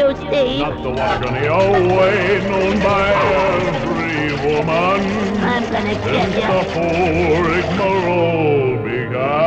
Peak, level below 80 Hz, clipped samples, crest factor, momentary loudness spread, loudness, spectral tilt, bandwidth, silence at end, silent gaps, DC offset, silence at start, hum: -4 dBFS; -36 dBFS; under 0.1%; 12 dB; 5 LU; -16 LUFS; -6.5 dB/octave; 8.8 kHz; 0 s; none; under 0.1%; 0 s; none